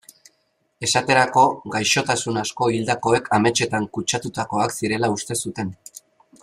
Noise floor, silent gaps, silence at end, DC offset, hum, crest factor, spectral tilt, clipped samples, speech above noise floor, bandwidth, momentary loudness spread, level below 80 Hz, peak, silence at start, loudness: -68 dBFS; none; 0.7 s; under 0.1%; none; 20 dB; -3.5 dB/octave; under 0.1%; 47 dB; 15.5 kHz; 9 LU; -58 dBFS; -2 dBFS; 0.8 s; -21 LUFS